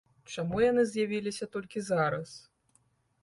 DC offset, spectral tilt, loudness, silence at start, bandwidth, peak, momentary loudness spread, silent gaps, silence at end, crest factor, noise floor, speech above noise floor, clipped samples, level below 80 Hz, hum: under 0.1%; -5.5 dB/octave; -30 LUFS; 0.3 s; 11.5 kHz; -16 dBFS; 15 LU; none; 0.85 s; 16 dB; -70 dBFS; 40 dB; under 0.1%; -62 dBFS; none